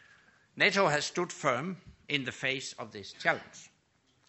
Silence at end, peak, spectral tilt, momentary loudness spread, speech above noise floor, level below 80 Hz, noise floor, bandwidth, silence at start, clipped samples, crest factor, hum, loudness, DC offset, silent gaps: 0.65 s; -10 dBFS; -3.5 dB/octave; 17 LU; 39 dB; -70 dBFS; -71 dBFS; 8.2 kHz; 0.55 s; under 0.1%; 24 dB; none; -31 LUFS; under 0.1%; none